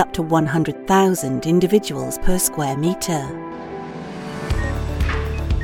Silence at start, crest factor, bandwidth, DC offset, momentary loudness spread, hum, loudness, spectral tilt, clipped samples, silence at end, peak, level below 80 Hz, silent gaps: 0 s; 18 dB; 19 kHz; under 0.1%; 15 LU; none; -20 LUFS; -5.5 dB/octave; under 0.1%; 0 s; -2 dBFS; -28 dBFS; none